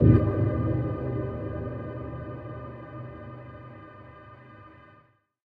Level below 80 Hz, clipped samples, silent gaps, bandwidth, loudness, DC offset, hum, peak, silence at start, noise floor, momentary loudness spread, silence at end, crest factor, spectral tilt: -42 dBFS; under 0.1%; none; 3.7 kHz; -30 LUFS; under 0.1%; none; -6 dBFS; 0 s; -61 dBFS; 22 LU; 0.75 s; 22 dB; -12 dB/octave